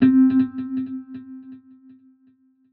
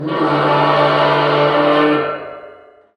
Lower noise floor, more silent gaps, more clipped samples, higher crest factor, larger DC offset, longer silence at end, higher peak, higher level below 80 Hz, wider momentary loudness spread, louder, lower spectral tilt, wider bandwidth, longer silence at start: first, -59 dBFS vs -42 dBFS; neither; neither; about the same, 16 dB vs 14 dB; neither; first, 1.15 s vs 0.45 s; second, -6 dBFS vs 0 dBFS; second, -64 dBFS vs -56 dBFS; first, 24 LU vs 9 LU; second, -20 LUFS vs -14 LUFS; about the same, -7.5 dB/octave vs -7 dB/octave; second, 4.3 kHz vs 9.8 kHz; about the same, 0 s vs 0 s